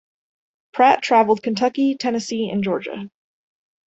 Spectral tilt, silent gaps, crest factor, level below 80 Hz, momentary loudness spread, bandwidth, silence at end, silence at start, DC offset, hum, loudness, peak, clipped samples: -5 dB/octave; none; 18 dB; -66 dBFS; 16 LU; 8.2 kHz; 0.8 s; 0.75 s; under 0.1%; none; -19 LUFS; -2 dBFS; under 0.1%